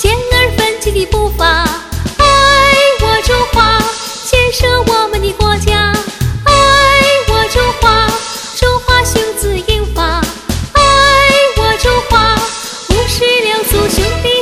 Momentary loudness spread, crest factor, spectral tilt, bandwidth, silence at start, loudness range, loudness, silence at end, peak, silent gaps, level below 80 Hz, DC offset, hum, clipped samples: 9 LU; 10 dB; -3.5 dB/octave; 17.5 kHz; 0 s; 2 LU; -10 LUFS; 0 s; 0 dBFS; none; -20 dBFS; under 0.1%; none; 0.5%